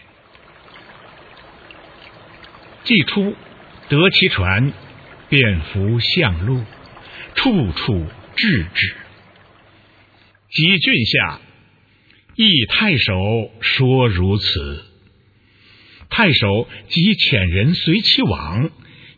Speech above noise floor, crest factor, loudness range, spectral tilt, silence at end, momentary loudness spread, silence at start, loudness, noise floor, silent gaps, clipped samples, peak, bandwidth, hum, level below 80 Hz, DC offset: 37 dB; 18 dB; 5 LU; -7 dB/octave; 0.5 s; 11 LU; 0.75 s; -16 LUFS; -53 dBFS; none; under 0.1%; 0 dBFS; 4.9 kHz; none; -40 dBFS; under 0.1%